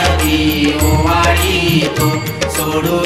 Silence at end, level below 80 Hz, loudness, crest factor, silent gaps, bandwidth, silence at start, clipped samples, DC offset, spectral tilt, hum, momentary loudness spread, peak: 0 s; -24 dBFS; -13 LUFS; 14 dB; none; 16 kHz; 0 s; under 0.1%; under 0.1%; -4.5 dB/octave; none; 5 LU; 0 dBFS